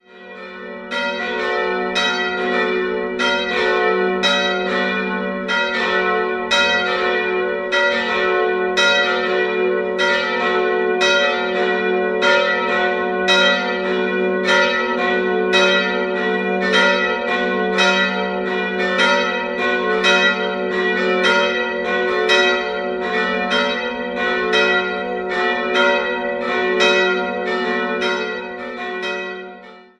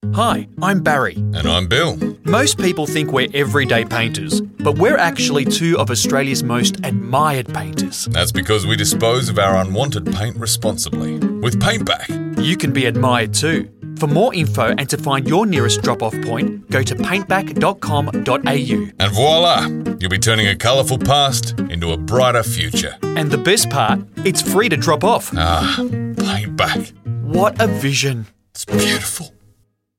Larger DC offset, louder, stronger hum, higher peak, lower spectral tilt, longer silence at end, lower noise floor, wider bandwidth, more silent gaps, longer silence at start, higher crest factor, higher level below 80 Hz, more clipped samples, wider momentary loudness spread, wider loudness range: neither; about the same, -17 LUFS vs -16 LUFS; neither; about the same, -2 dBFS vs -2 dBFS; about the same, -3.5 dB/octave vs -4.5 dB/octave; second, 0.2 s vs 0.7 s; second, -39 dBFS vs -57 dBFS; second, 11 kHz vs 17 kHz; neither; about the same, 0.15 s vs 0.05 s; about the same, 16 dB vs 16 dB; second, -54 dBFS vs -40 dBFS; neither; about the same, 8 LU vs 7 LU; about the same, 2 LU vs 3 LU